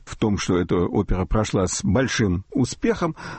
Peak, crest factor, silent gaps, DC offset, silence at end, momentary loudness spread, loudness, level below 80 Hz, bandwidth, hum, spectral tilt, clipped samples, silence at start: -8 dBFS; 14 dB; none; under 0.1%; 0 s; 3 LU; -22 LUFS; -34 dBFS; 8.8 kHz; none; -5.5 dB/octave; under 0.1%; 0.05 s